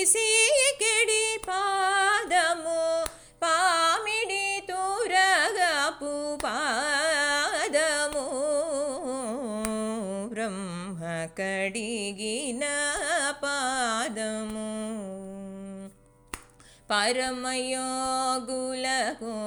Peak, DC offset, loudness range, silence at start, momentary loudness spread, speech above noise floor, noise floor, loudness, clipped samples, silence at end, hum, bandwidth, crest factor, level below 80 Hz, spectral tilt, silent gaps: -6 dBFS; under 0.1%; 7 LU; 0 s; 12 LU; 28 dB; -54 dBFS; -26 LUFS; under 0.1%; 0 s; none; over 20 kHz; 20 dB; -58 dBFS; -1.5 dB/octave; none